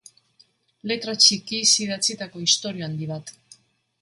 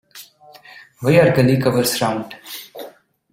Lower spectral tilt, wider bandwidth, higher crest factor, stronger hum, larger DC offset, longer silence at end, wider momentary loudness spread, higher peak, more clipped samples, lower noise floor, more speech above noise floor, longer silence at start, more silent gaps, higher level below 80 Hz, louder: second, -1.5 dB/octave vs -5.5 dB/octave; second, 11.5 kHz vs 16.5 kHz; first, 24 dB vs 18 dB; neither; neither; first, 0.7 s vs 0.45 s; second, 16 LU vs 22 LU; about the same, 0 dBFS vs -2 dBFS; neither; first, -61 dBFS vs -45 dBFS; first, 37 dB vs 29 dB; first, 0.85 s vs 0.15 s; neither; second, -68 dBFS vs -52 dBFS; second, -20 LUFS vs -16 LUFS